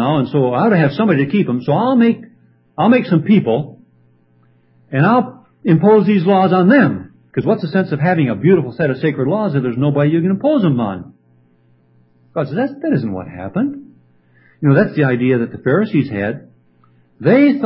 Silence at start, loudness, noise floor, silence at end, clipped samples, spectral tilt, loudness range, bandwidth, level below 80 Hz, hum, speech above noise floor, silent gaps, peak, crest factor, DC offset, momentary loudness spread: 0 s; -15 LUFS; -54 dBFS; 0 s; under 0.1%; -13 dB/octave; 6 LU; 5.8 kHz; -54 dBFS; none; 40 dB; none; 0 dBFS; 16 dB; under 0.1%; 12 LU